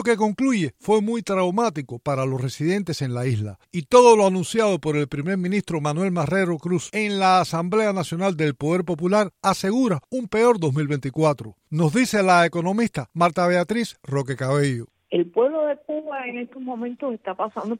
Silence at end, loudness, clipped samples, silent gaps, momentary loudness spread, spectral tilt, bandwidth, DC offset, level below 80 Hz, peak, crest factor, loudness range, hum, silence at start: 0 s; -22 LUFS; under 0.1%; none; 11 LU; -6 dB/octave; 15.5 kHz; under 0.1%; -58 dBFS; -2 dBFS; 20 dB; 4 LU; none; 0 s